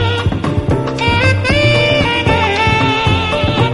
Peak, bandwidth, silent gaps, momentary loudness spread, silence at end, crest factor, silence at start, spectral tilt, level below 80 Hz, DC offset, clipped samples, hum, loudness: 0 dBFS; 11.5 kHz; none; 5 LU; 0 s; 12 dB; 0 s; -5.5 dB/octave; -28 dBFS; 0.2%; under 0.1%; none; -13 LUFS